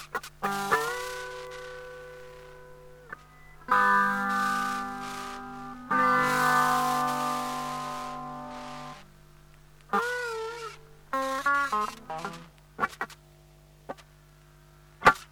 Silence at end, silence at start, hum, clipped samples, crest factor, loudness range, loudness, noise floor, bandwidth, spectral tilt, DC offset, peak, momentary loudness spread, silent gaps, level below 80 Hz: 0.05 s; 0 s; 50 Hz at -55 dBFS; under 0.1%; 26 dB; 8 LU; -28 LUFS; -55 dBFS; over 20 kHz; -3.5 dB/octave; under 0.1%; -6 dBFS; 23 LU; none; -56 dBFS